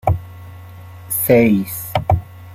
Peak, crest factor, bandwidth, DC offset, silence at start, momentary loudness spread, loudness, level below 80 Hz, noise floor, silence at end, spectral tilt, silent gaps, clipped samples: -2 dBFS; 16 dB; 16 kHz; under 0.1%; 0.05 s; 25 LU; -17 LUFS; -38 dBFS; -36 dBFS; 0 s; -6.5 dB/octave; none; under 0.1%